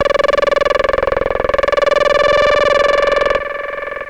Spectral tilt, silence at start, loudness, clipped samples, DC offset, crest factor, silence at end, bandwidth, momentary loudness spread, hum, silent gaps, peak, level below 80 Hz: -3.5 dB/octave; 0 s; -14 LUFS; under 0.1%; under 0.1%; 10 dB; 0 s; 10 kHz; 6 LU; none; none; -4 dBFS; -34 dBFS